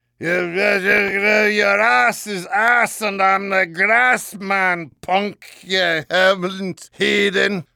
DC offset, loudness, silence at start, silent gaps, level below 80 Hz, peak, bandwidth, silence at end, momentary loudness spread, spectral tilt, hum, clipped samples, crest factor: under 0.1%; -16 LUFS; 0.2 s; none; -60 dBFS; -4 dBFS; 18.5 kHz; 0.15 s; 8 LU; -3.5 dB/octave; none; under 0.1%; 14 dB